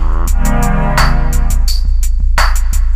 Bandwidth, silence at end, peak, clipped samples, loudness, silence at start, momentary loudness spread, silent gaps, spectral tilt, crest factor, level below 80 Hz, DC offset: 15.5 kHz; 0 s; 0 dBFS; under 0.1%; -15 LUFS; 0 s; 4 LU; none; -4.5 dB/octave; 10 dB; -10 dBFS; under 0.1%